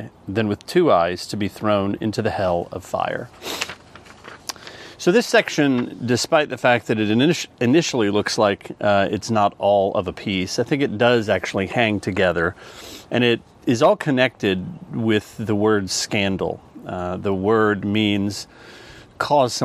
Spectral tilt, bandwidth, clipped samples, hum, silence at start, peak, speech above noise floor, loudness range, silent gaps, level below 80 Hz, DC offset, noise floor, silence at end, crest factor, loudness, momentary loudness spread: -5 dB/octave; 14.5 kHz; under 0.1%; none; 0 s; -2 dBFS; 24 dB; 4 LU; none; -54 dBFS; under 0.1%; -44 dBFS; 0 s; 20 dB; -20 LUFS; 12 LU